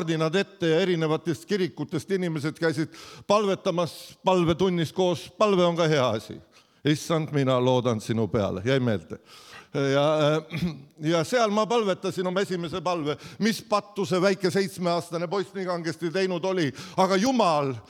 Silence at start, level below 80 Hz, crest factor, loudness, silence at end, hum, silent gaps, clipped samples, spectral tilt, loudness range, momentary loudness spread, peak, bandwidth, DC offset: 0 s; -60 dBFS; 18 dB; -25 LUFS; 0.05 s; none; none; under 0.1%; -5.5 dB/octave; 2 LU; 9 LU; -8 dBFS; 16 kHz; under 0.1%